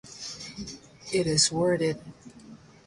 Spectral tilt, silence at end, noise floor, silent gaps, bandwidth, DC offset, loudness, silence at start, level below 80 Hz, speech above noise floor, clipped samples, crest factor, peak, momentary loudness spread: -3.5 dB/octave; 0.3 s; -50 dBFS; none; 11.5 kHz; under 0.1%; -26 LUFS; 0.05 s; -58 dBFS; 24 dB; under 0.1%; 22 dB; -8 dBFS; 19 LU